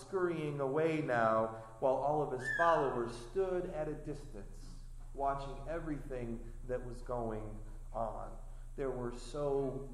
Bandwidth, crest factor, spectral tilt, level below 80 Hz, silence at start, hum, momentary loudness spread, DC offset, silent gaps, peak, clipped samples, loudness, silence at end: 12.5 kHz; 20 dB; -6.5 dB/octave; -48 dBFS; 0 s; none; 19 LU; under 0.1%; none; -18 dBFS; under 0.1%; -37 LUFS; 0 s